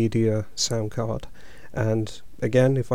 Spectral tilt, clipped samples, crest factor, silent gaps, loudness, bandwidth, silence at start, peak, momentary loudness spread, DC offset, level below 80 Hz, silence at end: -5.5 dB/octave; under 0.1%; 18 dB; none; -25 LUFS; 14.5 kHz; 0 s; -6 dBFS; 13 LU; 2%; -48 dBFS; 0 s